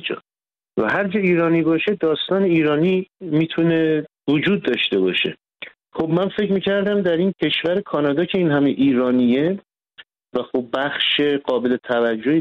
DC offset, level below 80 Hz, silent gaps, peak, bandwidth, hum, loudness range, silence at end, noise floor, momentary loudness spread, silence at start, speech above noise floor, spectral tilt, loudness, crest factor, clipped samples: under 0.1%; -60 dBFS; none; -8 dBFS; 5.6 kHz; none; 2 LU; 0 s; under -90 dBFS; 7 LU; 0 s; over 72 dB; -8 dB/octave; -19 LUFS; 12 dB; under 0.1%